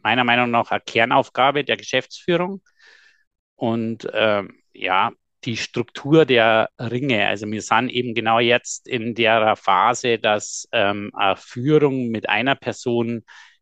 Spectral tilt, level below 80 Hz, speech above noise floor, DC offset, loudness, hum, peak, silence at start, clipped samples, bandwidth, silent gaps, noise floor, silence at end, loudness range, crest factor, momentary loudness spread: -4.5 dB/octave; -66 dBFS; 33 dB; under 0.1%; -20 LUFS; none; -2 dBFS; 0.05 s; under 0.1%; 9.2 kHz; 3.27-3.31 s, 3.39-3.57 s; -52 dBFS; 0.4 s; 5 LU; 18 dB; 10 LU